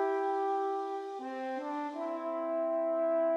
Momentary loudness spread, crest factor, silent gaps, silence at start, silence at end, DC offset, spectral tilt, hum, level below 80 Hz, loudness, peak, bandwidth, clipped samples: 7 LU; 10 dB; none; 0 s; 0 s; under 0.1%; -4 dB/octave; none; under -90 dBFS; -34 LUFS; -22 dBFS; 8.4 kHz; under 0.1%